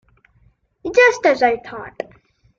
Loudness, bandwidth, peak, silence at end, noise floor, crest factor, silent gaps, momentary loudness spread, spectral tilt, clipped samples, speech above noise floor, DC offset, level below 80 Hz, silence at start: -15 LUFS; 7.6 kHz; -2 dBFS; 0.55 s; -58 dBFS; 18 dB; none; 20 LU; -3 dB/octave; under 0.1%; 41 dB; under 0.1%; -56 dBFS; 0.85 s